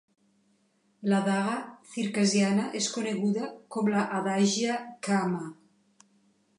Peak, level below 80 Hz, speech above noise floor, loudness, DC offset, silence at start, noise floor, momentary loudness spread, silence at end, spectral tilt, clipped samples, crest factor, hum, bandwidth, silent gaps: -12 dBFS; -80 dBFS; 41 dB; -28 LUFS; under 0.1%; 1 s; -69 dBFS; 10 LU; 1.05 s; -4.5 dB/octave; under 0.1%; 16 dB; none; 11 kHz; none